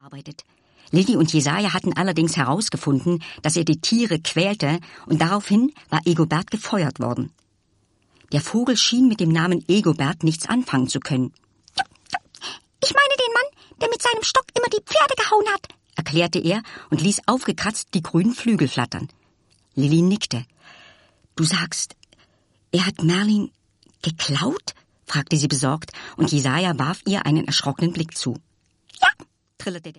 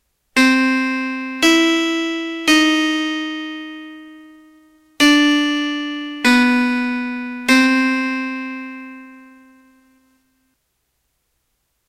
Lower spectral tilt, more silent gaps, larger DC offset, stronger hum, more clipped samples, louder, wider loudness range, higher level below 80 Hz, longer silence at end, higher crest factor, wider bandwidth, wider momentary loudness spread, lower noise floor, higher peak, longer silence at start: first, -4.5 dB/octave vs -1.5 dB/octave; neither; neither; neither; neither; second, -21 LUFS vs -16 LUFS; about the same, 4 LU vs 6 LU; about the same, -58 dBFS vs -56 dBFS; second, 0.1 s vs 2.7 s; about the same, 22 dB vs 18 dB; second, 11.5 kHz vs 16 kHz; second, 12 LU vs 16 LU; second, -65 dBFS vs -70 dBFS; about the same, 0 dBFS vs 0 dBFS; second, 0.1 s vs 0.35 s